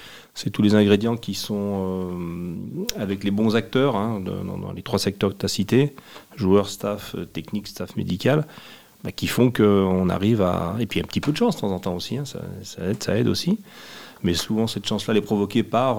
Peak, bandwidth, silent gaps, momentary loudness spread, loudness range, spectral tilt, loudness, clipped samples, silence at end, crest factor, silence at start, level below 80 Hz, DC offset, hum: -2 dBFS; 17.5 kHz; none; 13 LU; 4 LU; -6 dB/octave; -23 LUFS; under 0.1%; 0 s; 22 dB; 0 s; -56 dBFS; 0.3%; none